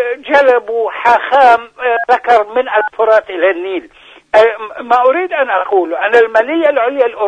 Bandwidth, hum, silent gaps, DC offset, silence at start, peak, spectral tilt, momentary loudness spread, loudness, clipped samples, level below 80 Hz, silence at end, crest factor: 9.4 kHz; none; none; under 0.1%; 0 s; 0 dBFS; -3.5 dB/octave; 6 LU; -12 LUFS; 0.3%; -56 dBFS; 0 s; 12 dB